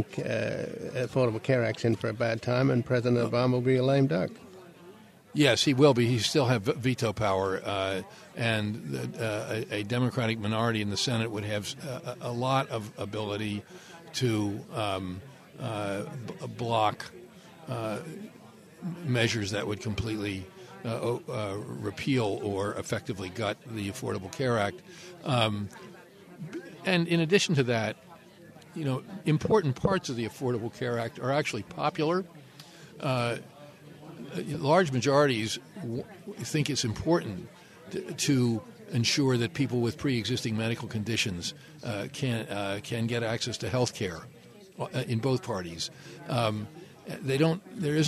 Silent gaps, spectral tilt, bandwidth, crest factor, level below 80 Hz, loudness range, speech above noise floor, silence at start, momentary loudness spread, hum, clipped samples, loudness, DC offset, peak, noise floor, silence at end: none; -5.5 dB/octave; 14.5 kHz; 20 dB; -60 dBFS; 7 LU; 23 dB; 0 s; 16 LU; none; under 0.1%; -29 LUFS; under 0.1%; -8 dBFS; -52 dBFS; 0 s